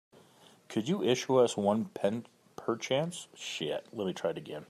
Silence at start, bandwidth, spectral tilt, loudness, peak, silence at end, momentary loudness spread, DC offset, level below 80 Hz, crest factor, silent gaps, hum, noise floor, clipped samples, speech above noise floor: 0.7 s; 14 kHz; -5 dB/octave; -32 LUFS; -14 dBFS; 0.05 s; 12 LU; under 0.1%; -78 dBFS; 20 dB; none; none; -60 dBFS; under 0.1%; 29 dB